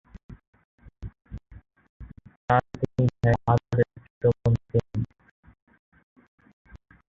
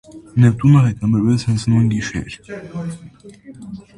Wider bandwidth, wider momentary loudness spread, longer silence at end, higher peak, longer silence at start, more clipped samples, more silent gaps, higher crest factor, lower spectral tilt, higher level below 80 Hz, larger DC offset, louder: second, 7 kHz vs 11 kHz; first, 25 LU vs 21 LU; first, 2.05 s vs 0.2 s; second, -6 dBFS vs -2 dBFS; first, 0.3 s vs 0.15 s; neither; first, 0.47-0.53 s, 0.65-0.78 s, 1.89-2.00 s, 2.36-2.48 s, 4.10-4.21 s vs none; first, 22 dB vs 16 dB; first, -9 dB/octave vs -7.5 dB/octave; about the same, -46 dBFS vs -44 dBFS; neither; second, -25 LUFS vs -16 LUFS